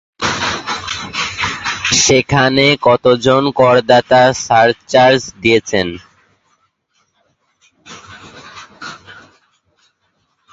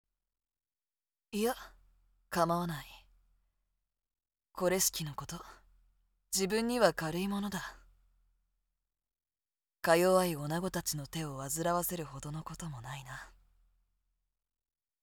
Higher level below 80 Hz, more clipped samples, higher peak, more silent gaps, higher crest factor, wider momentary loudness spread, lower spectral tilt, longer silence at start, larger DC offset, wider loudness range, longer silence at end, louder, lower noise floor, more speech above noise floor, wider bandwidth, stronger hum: first, -46 dBFS vs -62 dBFS; neither; first, 0 dBFS vs -12 dBFS; neither; second, 16 dB vs 24 dB; first, 21 LU vs 16 LU; about the same, -3.5 dB/octave vs -4 dB/octave; second, 0.2 s vs 1.3 s; neither; first, 10 LU vs 6 LU; second, 1.35 s vs 1.75 s; first, -12 LUFS vs -33 LUFS; second, -64 dBFS vs under -90 dBFS; second, 53 dB vs over 57 dB; second, 8 kHz vs over 20 kHz; neither